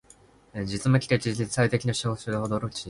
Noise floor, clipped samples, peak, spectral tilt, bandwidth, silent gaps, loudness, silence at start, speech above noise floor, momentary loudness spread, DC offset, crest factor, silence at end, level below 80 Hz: -56 dBFS; under 0.1%; -8 dBFS; -5.5 dB/octave; 11.5 kHz; none; -26 LUFS; 0.55 s; 30 dB; 9 LU; under 0.1%; 18 dB; 0 s; -52 dBFS